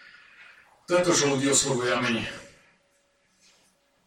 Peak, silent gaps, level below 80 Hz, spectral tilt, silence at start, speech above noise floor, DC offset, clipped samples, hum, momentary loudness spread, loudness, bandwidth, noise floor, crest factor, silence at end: -8 dBFS; none; -62 dBFS; -3 dB/octave; 0.4 s; 43 dB; under 0.1%; under 0.1%; none; 11 LU; -24 LUFS; 16.5 kHz; -67 dBFS; 20 dB; 1.6 s